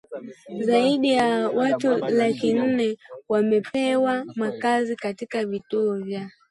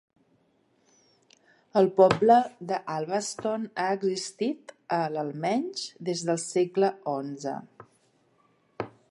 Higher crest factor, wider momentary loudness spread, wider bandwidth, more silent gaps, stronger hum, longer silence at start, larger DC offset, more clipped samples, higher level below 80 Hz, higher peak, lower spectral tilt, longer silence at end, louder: second, 14 dB vs 22 dB; second, 10 LU vs 14 LU; about the same, 11.5 kHz vs 11.5 kHz; neither; neither; second, 0.1 s vs 1.75 s; neither; neither; about the same, -68 dBFS vs -68 dBFS; about the same, -8 dBFS vs -6 dBFS; about the same, -5.5 dB/octave vs -5 dB/octave; about the same, 0.2 s vs 0.2 s; first, -23 LUFS vs -27 LUFS